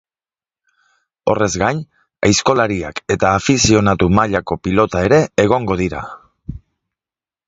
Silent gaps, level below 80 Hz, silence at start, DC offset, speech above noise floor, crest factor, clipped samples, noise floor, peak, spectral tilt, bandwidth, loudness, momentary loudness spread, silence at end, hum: none; -36 dBFS; 1.25 s; under 0.1%; over 75 dB; 16 dB; under 0.1%; under -90 dBFS; 0 dBFS; -5 dB/octave; 8 kHz; -15 LUFS; 15 LU; 0.9 s; none